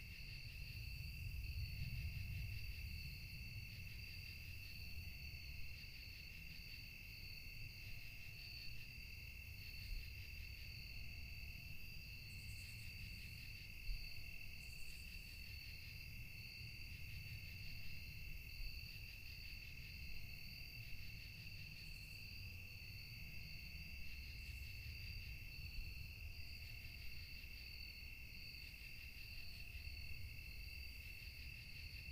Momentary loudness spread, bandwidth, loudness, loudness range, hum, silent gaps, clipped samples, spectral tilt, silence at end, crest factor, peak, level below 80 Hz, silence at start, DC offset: 3 LU; 15.5 kHz; -53 LUFS; 3 LU; none; none; under 0.1%; -3.5 dB/octave; 0 s; 18 dB; -34 dBFS; -56 dBFS; 0 s; under 0.1%